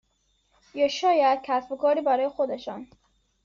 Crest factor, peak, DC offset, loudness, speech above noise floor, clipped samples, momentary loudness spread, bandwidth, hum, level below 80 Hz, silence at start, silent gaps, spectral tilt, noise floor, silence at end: 14 dB; -12 dBFS; under 0.1%; -24 LUFS; 46 dB; under 0.1%; 16 LU; 7.4 kHz; none; -68 dBFS; 0.75 s; none; -1 dB/octave; -70 dBFS; 0.6 s